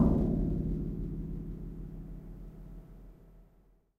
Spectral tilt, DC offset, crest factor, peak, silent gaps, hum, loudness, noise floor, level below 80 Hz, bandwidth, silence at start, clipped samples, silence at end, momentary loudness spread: -11.5 dB/octave; under 0.1%; 22 dB; -12 dBFS; none; none; -36 LUFS; -64 dBFS; -40 dBFS; 3.3 kHz; 0 s; under 0.1%; 0.55 s; 22 LU